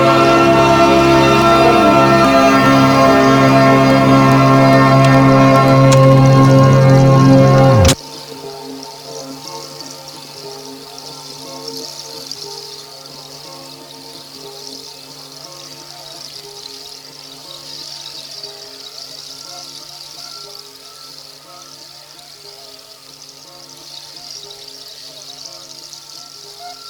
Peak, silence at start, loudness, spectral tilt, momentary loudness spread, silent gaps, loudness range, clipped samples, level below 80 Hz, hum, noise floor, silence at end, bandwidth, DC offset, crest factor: 0 dBFS; 0 s; -9 LUFS; -6 dB/octave; 23 LU; none; 24 LU; under 0.1%; -38 dBFS; none; -38 dBFS; 0 s; 19.5 kHz; under 0.1%; 14 dB